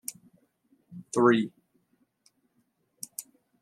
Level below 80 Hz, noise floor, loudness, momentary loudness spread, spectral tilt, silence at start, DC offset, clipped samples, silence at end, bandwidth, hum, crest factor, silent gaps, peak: -80 dBFS; -73 dBFS; -27 LUFS; 24 LU; -5 dB/octave; 0.1 s; under 0.1%; under 0.1%; 0.4 s; 15 kHz; none; 24 dB; none; -8 dBFS